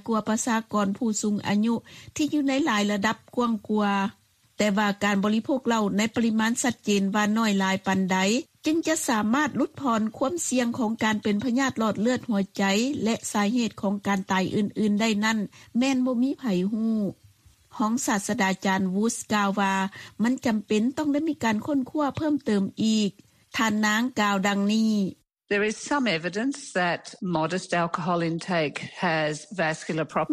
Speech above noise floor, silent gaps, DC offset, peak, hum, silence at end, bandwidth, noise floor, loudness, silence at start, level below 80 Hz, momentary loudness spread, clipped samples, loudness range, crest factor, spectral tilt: 32 dB; none; under 0.1%; -10 dBFS; none; 0 s; 14 kHz; -57 dBFS; -25 LUFS; 0.05 s; -64 dBFS; 5 LU; under 0.1%; 2 LU; 16 dB; -4.5 dB/octave